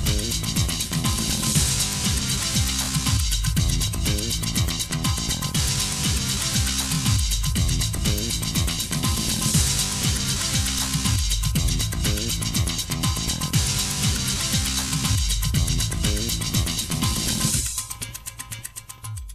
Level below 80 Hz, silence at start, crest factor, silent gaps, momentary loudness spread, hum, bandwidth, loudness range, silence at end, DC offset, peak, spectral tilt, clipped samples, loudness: -30 dBFS; 0 s; 16 dB; none; 3 LU; none; 15.5 kHz; 1 LU; 0 s; under 0.1%; -8 dBFS; -3 dB/octave; under 0.1%; -22 LUFS